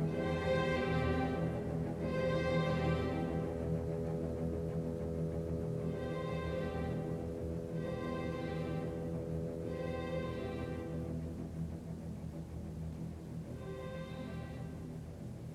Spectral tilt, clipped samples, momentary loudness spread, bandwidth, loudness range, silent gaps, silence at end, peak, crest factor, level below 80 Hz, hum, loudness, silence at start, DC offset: -7.5 dB/octave; under 0.1%; 11 LU; 12.5 kHz; 9 LU; none; 0 s; -22 dBFS; 16 dB; -50 dBFS; none; -39 LUFS; 0 s; under 0.1%